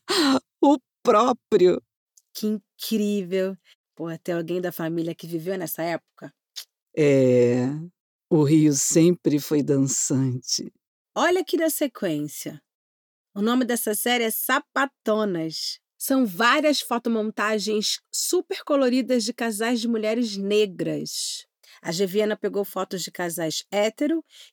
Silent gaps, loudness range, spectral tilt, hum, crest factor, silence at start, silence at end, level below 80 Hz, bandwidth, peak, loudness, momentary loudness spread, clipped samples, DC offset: 1.96-2.07 s, 3.75-3.84 s, 6.82-6.87 s, 8.00-8.20 s, 10.87-11.05 s, 12.75-13.25 s; 7 LU; -4.5 dB/octave; none; 16 dB; 0.1 s; 0.1 s; -74 dBFS; over 20 kHz; -6 dBFS; -23 LUFS; 12 LU; under 0.1%; under 0.1%